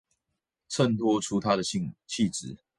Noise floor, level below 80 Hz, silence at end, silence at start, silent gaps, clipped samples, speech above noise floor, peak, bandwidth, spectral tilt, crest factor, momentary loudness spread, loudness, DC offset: -84 dBFS; -62 dBFS; 0.2 s; 0.7 s; none; under 0.1%; 56 dB; -10 dBFS; 11.5 kHz; -5 dB/octave; 20 dB; 10 LU; -28 LUFS; under 0.1%